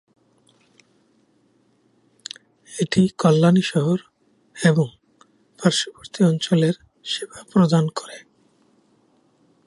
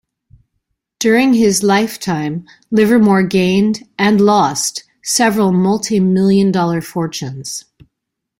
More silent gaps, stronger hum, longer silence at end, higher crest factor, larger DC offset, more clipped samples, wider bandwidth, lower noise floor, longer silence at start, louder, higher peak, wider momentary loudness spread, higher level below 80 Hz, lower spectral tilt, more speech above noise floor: neither; neither; first, 1.5 s vs 0.8 s; first, 20 dB vs 14 dB; neither; neither; second, 11.5 kHz vs 16.5 kHz; second, -62 dBFS vs -78 dBFS; first, 2.7 s vs 1 s; second, -20 LUFS vs -14 LUFS; about the same, -2 dBFS vs -2 dBFS; first, 20 LU vs 12 LU; second, -62 dBFS vs -52 dBFS; about the same, -6 dB/octave vs -5 dB/octave; second, 43 dB vs 64 dB